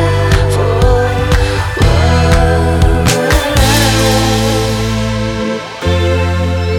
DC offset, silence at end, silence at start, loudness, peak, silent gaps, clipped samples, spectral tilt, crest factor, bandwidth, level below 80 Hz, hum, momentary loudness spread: under 0.1%; 0 s; 0 s; -12 LUFS; 0 dBFS; none; under 0.1%; -5 dB/octave; 10 dB; 18 kHz; -18 dBFS; none; 6 LU